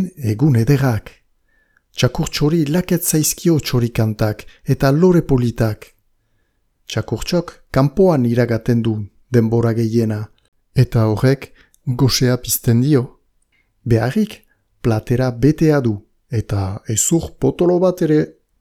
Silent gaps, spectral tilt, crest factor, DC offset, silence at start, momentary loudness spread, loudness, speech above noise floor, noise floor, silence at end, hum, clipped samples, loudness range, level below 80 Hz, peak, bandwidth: 10.48-10.52 s; -6 dB/octave; 16 dB; under 0.1%; 0 s; 11 LU; -17 LUFS; 47 dB; -63 dBFS; 0.3 s; none; under 0.1%; 2 LU; -38 dBFS; 0 dBFS; 17.5 kHz